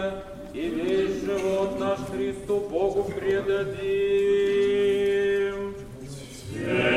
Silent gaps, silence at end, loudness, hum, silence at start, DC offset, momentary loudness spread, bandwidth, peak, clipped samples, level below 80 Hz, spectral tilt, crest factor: none; 0 s; -25 LUFS; none; 0 s; under 0.1%; 15 LU; 13 kHz; -8 dBFS; under 0.1%; -50 dBFS; -5.5 dB/octave; 16 dB